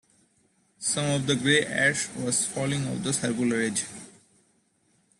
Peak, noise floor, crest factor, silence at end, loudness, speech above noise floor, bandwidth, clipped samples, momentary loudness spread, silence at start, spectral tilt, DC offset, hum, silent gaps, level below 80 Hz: -8 dBFS; -68 dBFS; 20 dB; 1.1 s; -25 LUFS; 42 dB; 12.5 kHz; under 0.1%; 8 LU; 0.8 s; -3.5 dB/octave; under 0.1%; none; none; -64 dBFS